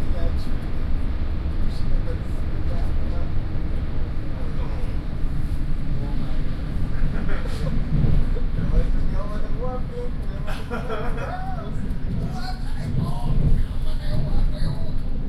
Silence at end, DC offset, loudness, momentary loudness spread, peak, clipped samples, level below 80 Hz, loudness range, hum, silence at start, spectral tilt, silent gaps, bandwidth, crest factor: 0 s; under 0.1%; -28 LUFS; 6 LU; -8 dBFS; under 0.1%; -22 dBFS; 3 LU; none; 0 s; -8 dB/octave; none; 5.4 kHz; 12 dB